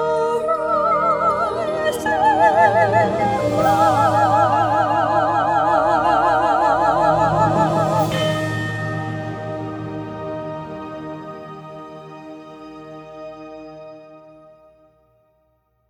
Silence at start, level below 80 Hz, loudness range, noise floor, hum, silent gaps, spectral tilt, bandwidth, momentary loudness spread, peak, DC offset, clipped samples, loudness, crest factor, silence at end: 0 s; -48 dBFS; 20 LU; -64 dBFS; none; none; -6 dB/octave; over 20 kHz; 21 LU; -2 dBFS; under 0.1%; under 0.1%; -18 LUFS; 16 dB; 1.7 s